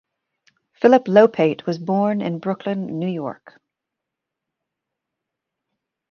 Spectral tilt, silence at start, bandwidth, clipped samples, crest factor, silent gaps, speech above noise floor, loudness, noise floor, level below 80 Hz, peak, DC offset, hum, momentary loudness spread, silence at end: -8 dB/octave; 0.8 s; 6.8 kHz; under 0.1%; 20 dB; none; 65 dB; -19 LUFS; -83 dBFS; -68 dBFS; -2 dBFS; under 0.1%; none; 12 LU; 2.8 s